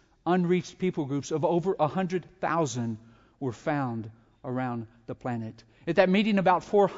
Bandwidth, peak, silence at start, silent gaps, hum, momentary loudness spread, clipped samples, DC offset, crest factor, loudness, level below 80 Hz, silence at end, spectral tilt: 7.8 kHz; -8 dBFS; 0.25 s; none; none; 15 LU; under 0.1%; under 0.1%; 20 dB; -28 LUFS; -64 dBFS; 0 s; -6.5 dB/octave